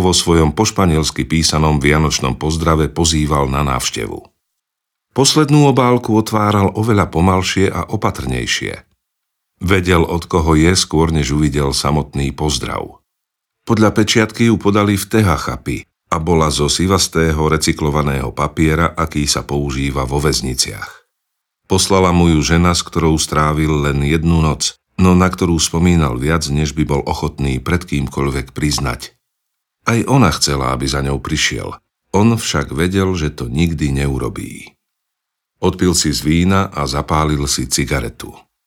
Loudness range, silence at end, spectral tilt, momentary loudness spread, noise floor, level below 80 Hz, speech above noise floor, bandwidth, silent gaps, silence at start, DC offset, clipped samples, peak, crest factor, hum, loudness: 4 LU; 0.3 s; -5 dB/octave; 8 LU; -79 dBFS; -28 dBFS; 65 dB; 17.5 kHz; none; 0 s; under 0.1%; under 0.1%; 0 dBFS; 16 dB; none; -15 LUFS